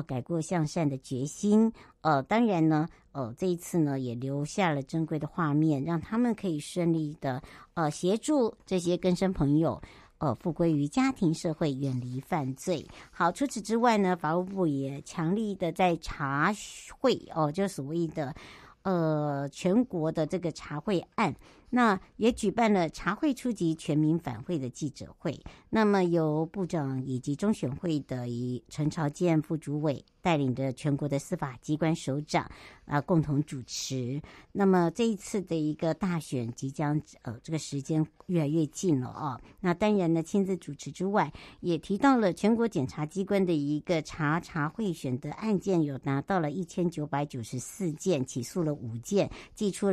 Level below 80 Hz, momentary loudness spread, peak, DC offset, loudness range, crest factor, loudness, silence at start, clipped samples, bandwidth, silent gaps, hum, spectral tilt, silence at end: -58 dBFS; 10 LU; -10 dBFS; under 0.1%; 3 LU; 20 dB; -30 LUFS; 0 s; under 0.1%; 14 kHz; none; none; -6.5 dB/octave; 0 s